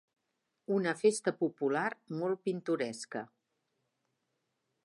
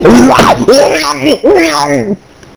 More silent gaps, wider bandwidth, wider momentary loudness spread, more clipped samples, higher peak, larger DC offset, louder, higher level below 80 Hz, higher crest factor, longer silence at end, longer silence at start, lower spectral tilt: neither; second, 11.5 kHz vs over 20 kHz; first, 13 LU vs 9 LU; second, under 0.1% vs 9%; second, -16 dBFS vs 0 dBFS; neither; second, -34 LUFS vs -7 LUFS; second, -88 dBFS vs -32 dBFS; first, 20 dB vs 8 dB; first, 1.6 s vs 0.4 s; first, 0.7 s vs 0 s; about the same, -5 dB/octave vs -4.5 dB/octave